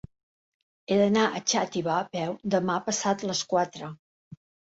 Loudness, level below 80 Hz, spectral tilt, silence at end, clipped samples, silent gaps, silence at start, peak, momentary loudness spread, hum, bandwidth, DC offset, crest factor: -26 LUFS; -66 dBFS; -4 dB/octave; 0.35 s; under 0.1%; 3.99-4.31 s; 0.9 s; -10 dBFS; 9 LU; none; 8 kHz; under 0.1%; 18 dB